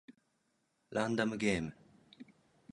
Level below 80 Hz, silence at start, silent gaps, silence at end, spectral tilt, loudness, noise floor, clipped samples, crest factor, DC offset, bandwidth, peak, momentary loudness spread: -64 dBFS; 0.1 s; none; 0.5 s; -5.5 dB/octave; -36 LUFS; -79 dBFS; under 0.1%; 22 dB; under 0.1%; 11 kHz; -18 dBFS; 24 LU